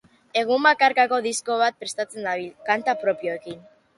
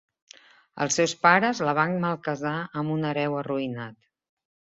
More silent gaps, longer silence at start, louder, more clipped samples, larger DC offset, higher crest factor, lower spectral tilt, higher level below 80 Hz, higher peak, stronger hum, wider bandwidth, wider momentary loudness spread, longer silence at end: neither; second, 0.35 s vs 0.75 s; first, -22 LUFS vs -25 LUFS; neither; neither; about the same, 20 dB vs 22 dB; second, -2 dB/octave vs -4.5 dB/octave; about the same, -72 dBFS vs -68 dBFS; about the same, -4 dBFS vs -4 dBFS; neither; first, 11.5 kHz vs 8.2 kHz; about the same, 12 LU vs 11 LU; second, 0.4 s vs 0.85 s